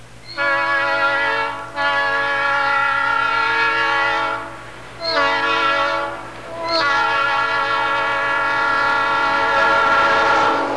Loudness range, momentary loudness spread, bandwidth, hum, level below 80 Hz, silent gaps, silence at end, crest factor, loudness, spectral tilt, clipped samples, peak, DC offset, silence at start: 3 LU; 9 LU; 11 kHz; none; -50 dBFS; none; 0 s; 12 dB; -17 LUFS; -3 dB/octave; under 0.1%; -6 dBFS; 0.8%; 0 s